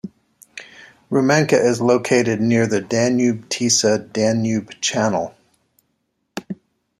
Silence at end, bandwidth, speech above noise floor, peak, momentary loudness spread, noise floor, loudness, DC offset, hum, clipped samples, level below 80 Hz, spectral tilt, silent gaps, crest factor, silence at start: 0.45 s; 14 kHz; 53 dB; -2 dBFS; 20 LU; -71 dBFS; -18 LUFS; under 0.1%; none; under 0.1%; -60 dBFS; -4.5 dB/octave; none; 18 dB; 0.05 s